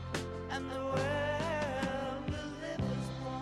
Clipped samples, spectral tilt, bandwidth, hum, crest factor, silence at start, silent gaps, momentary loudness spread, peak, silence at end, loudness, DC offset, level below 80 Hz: under 0.1%; -5.5 dB/octave; 13.5 kHz; none; 14 dB; 0 s; none; 6 LU; -22 dBFS; 0 s; -36 LUFS; under 0.1%; -52 dBFS